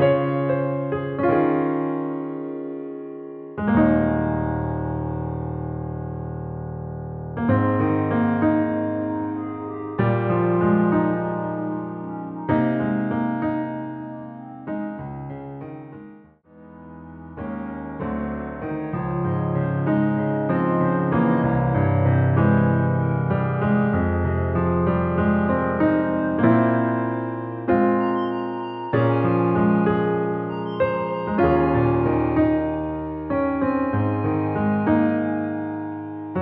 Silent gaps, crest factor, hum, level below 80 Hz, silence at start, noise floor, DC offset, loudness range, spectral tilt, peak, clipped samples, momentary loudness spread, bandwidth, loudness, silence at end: none; 16 dB; none; -44 dBFS; 0 s; -48 dBFS; under 0.1%; 9 LU; -8.5 dB/octave; -4 dBFS; under 0.1%; 13 LU; 4.6 kHz; -22 LUFS; 0 s